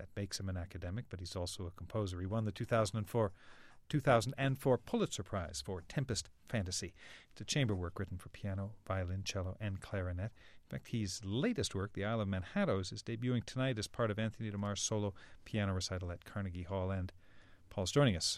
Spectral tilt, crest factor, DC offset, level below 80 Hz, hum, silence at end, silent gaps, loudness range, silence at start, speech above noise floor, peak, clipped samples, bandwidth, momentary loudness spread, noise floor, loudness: -5 dB/octave; 22 dB; under 0.1%; -60 dBFS; none; 0 s; none; 5 LU; 0 s; 21 dB; -16 dBFS; under 0.1%; 14.5 kHz; 10 LU; -59 dBFS; -38 LUFS